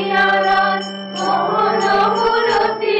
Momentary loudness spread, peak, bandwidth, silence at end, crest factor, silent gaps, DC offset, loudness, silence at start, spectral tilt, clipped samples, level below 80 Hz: 7 LU; -6 dBFS; 9.2 kHz; 0 s; 10 dB; none; under 0.1%; -16 LUFS; 0 s; -4 dB/octave; under 0.1%; -50 dBFS